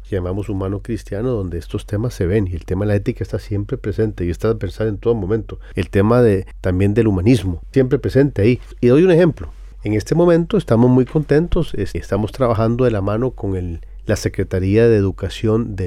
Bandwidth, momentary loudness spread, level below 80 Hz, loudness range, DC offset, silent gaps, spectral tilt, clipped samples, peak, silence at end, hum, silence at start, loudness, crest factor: 13.5 kHz; 11 LU; -34 dBFS; 6 LU; under 0.1%; none; -8 dB/octave; under 0.1%; -4 dBFS; 0 s; none; 0 s; -18 LUFS; 12 dB